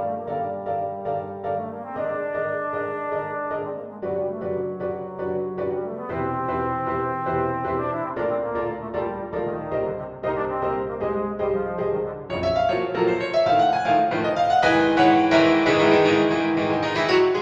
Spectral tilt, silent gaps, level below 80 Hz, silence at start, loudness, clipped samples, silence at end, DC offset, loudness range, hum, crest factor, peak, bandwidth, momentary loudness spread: -6 dB/octave; none; -52 dBFS; 0 s; -23 LUFS; under 0.1%; 0 s; under 0.1%; 9 LU; none; 20 dB; -4 dBFS; 8 kHz; 11 LU